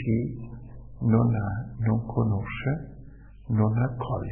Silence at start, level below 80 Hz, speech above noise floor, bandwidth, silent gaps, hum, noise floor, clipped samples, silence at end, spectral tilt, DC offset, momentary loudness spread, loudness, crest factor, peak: 0 s; -46 dBFS; 20 dB; 3.3 kHz; none; none; -46 dBFS; under 0.1%; 0 s; -12.5 dB/octave; under 0.1%; 18 LU; -27 LUFS; 18 dB; -8 dBFS